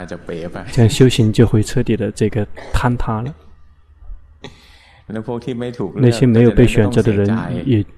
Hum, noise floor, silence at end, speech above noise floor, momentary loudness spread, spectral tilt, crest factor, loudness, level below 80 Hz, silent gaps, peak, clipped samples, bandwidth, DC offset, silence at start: none; -46 dBFS; 0.15 s; 31 dB; 16 LU; -7 dB/octave; 16 dB; -16 LUFS; -30 dBFS; none; 0 dBFS; under 0.1%; 13 kHz; under 0.1%; 0 s